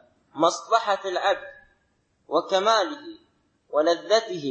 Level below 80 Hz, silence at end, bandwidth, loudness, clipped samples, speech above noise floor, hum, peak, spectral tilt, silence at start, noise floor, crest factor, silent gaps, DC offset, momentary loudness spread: -72 dBFS; 0 s; 8.6 kHz; -24 LUFS; under 0.1%; 45 dB; none; -6 dBFS; -2.5 dB/octave; 0.35 s; -69 dBFS; 20 dB; none; under 0.1%; 16 LU